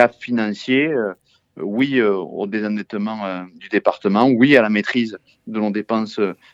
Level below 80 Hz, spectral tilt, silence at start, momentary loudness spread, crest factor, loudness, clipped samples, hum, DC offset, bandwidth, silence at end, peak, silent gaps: -68 dBFS; -7 dB/octave; 0 s; 13 LU; 18 dB; -19 LUFS; under 0.1%; none; under 0.1%; 7.8 kHz; 0.2 s; 0 dBFS; none